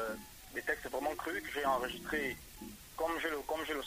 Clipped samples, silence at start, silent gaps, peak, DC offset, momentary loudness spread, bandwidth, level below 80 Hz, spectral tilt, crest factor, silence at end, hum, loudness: under 0.1%; 0 s; none; -20 dBFS; under 0.1%; 12 LU; 16 kHz; -60 dBFS; -3 dB/octave; 18 dB; 0 s; none; -38 LUFS